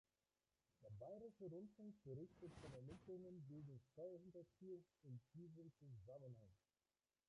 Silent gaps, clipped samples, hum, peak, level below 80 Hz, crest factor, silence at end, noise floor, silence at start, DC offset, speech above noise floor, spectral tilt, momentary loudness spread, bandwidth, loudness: none; under 0.1%; none; -46 dBFS; -82 dBFS; 14 dB; 0.75 s; under -90 dBFS; 0.8 s; under 0.1%; over 30 dB; -8.5 dB/octave; 6 LU; 11 kHz; -61 LUFS